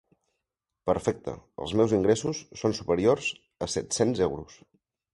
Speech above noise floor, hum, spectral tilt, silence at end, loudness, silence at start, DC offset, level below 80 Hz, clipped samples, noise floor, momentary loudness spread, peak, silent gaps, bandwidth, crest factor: 59 dB; none; -5 dB/octave; 0.6 s; -27 LUFS; 0.85 s; under 0.1%; -54 dBFS; under 0.1%; -86 dBFS; 12 LU; -8 dBFS; none; 11.5 kHz; 20 dB